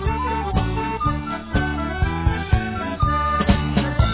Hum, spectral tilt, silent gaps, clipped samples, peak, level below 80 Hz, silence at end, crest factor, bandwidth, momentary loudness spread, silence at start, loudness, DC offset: none; -11 dB/octave; none; under 0.1%; -4 dBFS; -26 dBFS; 0 s; 18 dB; 4 kHz; 5 LU; 0 s; -22 LUFS; 0.3%